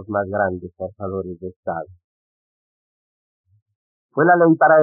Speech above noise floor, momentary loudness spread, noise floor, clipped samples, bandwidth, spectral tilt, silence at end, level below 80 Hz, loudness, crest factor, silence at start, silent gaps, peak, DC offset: over 72 dB; 18 LU; under -90 dBFS; under 0.1%; 2.2 kHz; -2 dB/octave; 0 s; -62 dBFS; -19 LUFS; 18 dB; 0 s; 1.56-1.63 s, 2.04-3.44 s, 3.62-3.66 s, 3.75-4.09 s; -2 dBFS; under 0.1%